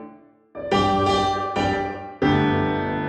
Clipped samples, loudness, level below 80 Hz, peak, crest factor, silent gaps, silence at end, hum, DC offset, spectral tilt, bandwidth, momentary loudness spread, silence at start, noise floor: under 0.1%; -22 LUFS; -44 dBFS; -8 dBFS; 16 dB; none; 0 s; none; under 0.1%; -6 dB/octave; 11 kHz; 9 LU; 0 s; -47 dBFS